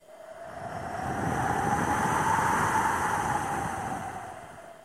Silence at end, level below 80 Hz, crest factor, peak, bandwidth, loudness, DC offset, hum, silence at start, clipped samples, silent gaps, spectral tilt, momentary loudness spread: 0 s; -50 dBFS; 18 dB; -12 dBFS; 16 kHz; -28 LUFS; under 0.1%; none; 0.1 s; under 0.1%; none; -4.5 dB/octave; 17 LU